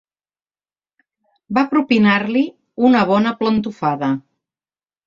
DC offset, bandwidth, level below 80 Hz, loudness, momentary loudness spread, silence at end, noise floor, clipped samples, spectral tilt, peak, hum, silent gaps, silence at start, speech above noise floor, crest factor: under 0.1%; 7.4 kHz; -58 dBFS; -17 LUFS; 8 LU; 0.85 s; under -90 dBFS; under 0.1%; -7.5 dB/octave; -2 dBFS; none; none; 1.5 s; over 74 dB; 18 dB